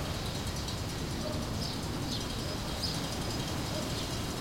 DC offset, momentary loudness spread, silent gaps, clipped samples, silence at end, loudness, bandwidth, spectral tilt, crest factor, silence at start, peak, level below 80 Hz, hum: under 0.1%; 2 LU; none; under 0.1%; 0 s; -35 LUFS; 16.5 kHz; -4 dB/octave; 14 dB; 0 s; -20 dBFS; -44 dBFS; none